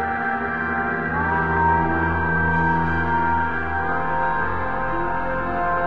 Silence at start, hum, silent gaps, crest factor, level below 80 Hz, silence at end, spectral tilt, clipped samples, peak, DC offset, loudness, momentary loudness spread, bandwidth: 0 s; none; none; 14 dB; -36 dBFS; 0 s; -9 dB/octave; under 0.1%; -8 dBFS; under 0.1%; -21 LUFS; 5 LU; 5.8 kHz